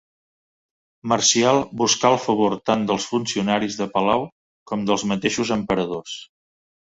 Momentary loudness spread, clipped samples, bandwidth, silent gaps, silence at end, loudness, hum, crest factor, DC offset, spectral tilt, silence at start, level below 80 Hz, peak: 12 LU; under 0.1%; 8 kHz; 4.32-4.66 s; 0.6 s; -21 LUFS; none; 20 dB; under 0.1%; -3.5 dB/octave; 1.05 s; -56 dBFS; -2 dBFS